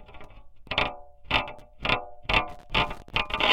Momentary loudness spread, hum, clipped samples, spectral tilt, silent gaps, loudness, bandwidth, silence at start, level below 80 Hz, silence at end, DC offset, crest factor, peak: 6 LU; none; under 0.1%; -4 dB/octave; none; -27 LUFS; 16 kHz; 0 s; -42 dBFS; 0 s; under 0.1%; 24 dB; -4 dBFS